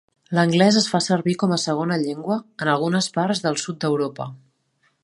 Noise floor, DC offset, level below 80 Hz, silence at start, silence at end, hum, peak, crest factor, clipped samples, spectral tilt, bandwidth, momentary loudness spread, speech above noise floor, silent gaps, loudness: -67 dBFS; under 0.1%; -66 dBFS; 0.3 s; 0.7 s; none; -2 dBFS; 20 dB; under 0.1%; -5 dB/octave; 11.5 kHz; 9 LU; 46 dB; none; -21 LUFS